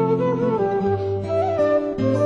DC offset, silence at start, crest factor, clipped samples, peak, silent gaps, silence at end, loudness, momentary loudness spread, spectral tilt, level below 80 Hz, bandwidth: under 0.1%; 0 s; 12 dB; under 0.1%; -8 dBFS; none; 0 s; -21 LUFS; 3 LU; -9 dB/octave; -50 dBFS; 9.6 kHz